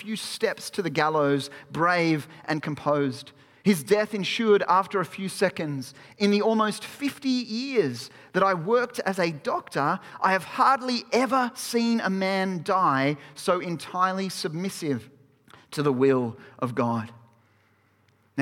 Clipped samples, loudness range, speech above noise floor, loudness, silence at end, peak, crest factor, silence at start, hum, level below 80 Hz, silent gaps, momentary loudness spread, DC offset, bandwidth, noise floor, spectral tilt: under 0.1%; 4 LU; 39 dB; -25 LUFS; 0 s; -8 dBFS; 18 dB; 0 s; none; -72 dBFS; none; 10 LU; under 0.1%; 17 kHz; -64 dBFS; -5 dB/octave